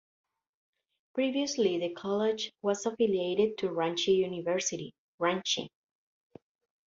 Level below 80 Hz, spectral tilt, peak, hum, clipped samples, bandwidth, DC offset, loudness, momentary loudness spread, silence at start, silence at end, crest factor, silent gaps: -74 dBFS; -3.5 dB/octave; -14 dBFS; none; under 0.1%; 7.8 kHz; under 0.1%; -30 LUFS; 6 LU; 1.15 s; 1.2 s; 18 dB; 4.98-5.18 s